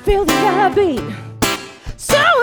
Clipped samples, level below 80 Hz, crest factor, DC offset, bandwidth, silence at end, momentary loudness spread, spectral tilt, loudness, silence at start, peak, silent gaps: under 0.1%; -32 dBFS; 14 dB; under 0.1%; 19.5 kHz; 0 s; 14 LU; -3.5 dB/octave; -16 LUFS; 0 s; -2 dBFS; none